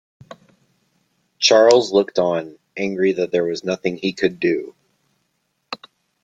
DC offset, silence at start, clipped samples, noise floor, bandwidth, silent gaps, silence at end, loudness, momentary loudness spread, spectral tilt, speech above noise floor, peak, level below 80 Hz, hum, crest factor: under 0.1%; 1.4 s; under 0.1%; -70 dBFS; 9.2 kHz; none; 0.5 s; -18 LUFS; 21 LU; -4 dB/octave; 53 dB; -2 dBFS; -64 dBFS; none; 20 dB